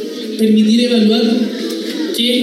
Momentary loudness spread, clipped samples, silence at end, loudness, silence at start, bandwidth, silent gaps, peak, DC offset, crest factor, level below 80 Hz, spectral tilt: 9 LU; under 0.1%; 0 s; -14 LUFS; 0 s; 14.5 kHz; none; -2 dBFS; under 0.1%; 12 dB; -66 dBFS; -5 dB/octave